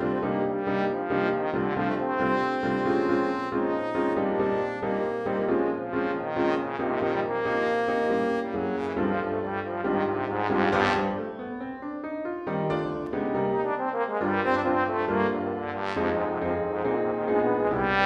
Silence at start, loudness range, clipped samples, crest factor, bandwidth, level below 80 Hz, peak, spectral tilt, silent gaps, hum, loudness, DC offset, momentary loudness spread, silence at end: 0 s; 2 LU; under 0.1%; 18 dB; 8.8 kHz; -56 dBFS; -8 dBFS; -7.5 dB/octave; none; none; -27 LUFS; under 0.1%; 6 LU; 0 s